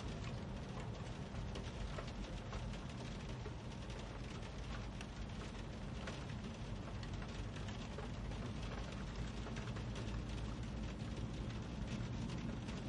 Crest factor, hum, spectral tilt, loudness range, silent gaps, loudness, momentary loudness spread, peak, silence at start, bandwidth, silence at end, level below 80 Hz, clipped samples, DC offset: 14 dB; none; -6 dB/octave; 2 LU; none; -47 LUFS; 3 LU; -32 dBFS; 0 s; 11 kHz; 0 s; -50 dBFS; under 0.1%; under 0.1%